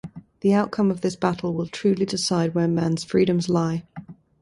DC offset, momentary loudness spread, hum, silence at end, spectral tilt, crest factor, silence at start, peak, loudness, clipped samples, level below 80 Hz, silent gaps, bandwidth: under 0.1%; 7 LU; none; 0.3 s; -6 dB/octave; 18 dB; 0.05 s; -6 dBFS; -23 LUFS; under 0.1%; -56 dBFS; none; 11.5 kHz